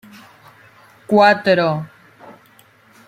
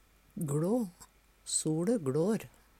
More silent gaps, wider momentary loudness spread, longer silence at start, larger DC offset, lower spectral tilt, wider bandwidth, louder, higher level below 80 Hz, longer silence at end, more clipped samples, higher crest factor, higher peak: neither; first, 14 LU vs 11 LU; first, 1.1 s vs 0.35 s; neither; about the same, -6.5 dB/octave vs -5.5 dB/octave; about the same, 15.5 kHz vs 16 kHz; first, -15 LUFS vs -33 LUFS; about the same, -64 dBFS vs -66 dBFS; first, 0.8 s vs 0.3 s; neither; about the same, 18 dB vs 14 dB; first, -2 dBFS vs -18 dBFS